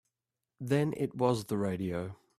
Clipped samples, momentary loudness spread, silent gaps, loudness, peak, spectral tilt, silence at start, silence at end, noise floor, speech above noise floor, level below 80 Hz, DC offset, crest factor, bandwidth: under 0.1%; 7 LU; none; -32 LUFS; -14 dBFS; -7 dB/octave; 0.6 s; 0.25 s; -89 dBFS; 58 dB; -66 dBFS; under 0.1%; 20 dB; 14.5 kHz